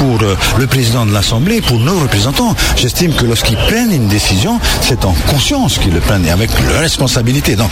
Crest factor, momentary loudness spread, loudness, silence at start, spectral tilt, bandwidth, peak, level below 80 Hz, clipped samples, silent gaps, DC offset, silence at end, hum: 10 dB; 1 LU; -11 LUFS; 0 s; -4.5 dB/octave; 16.5 kHz; 0 dBFS; -20 dBFS; under 0.1%; none; under 0.1%; 0 s; none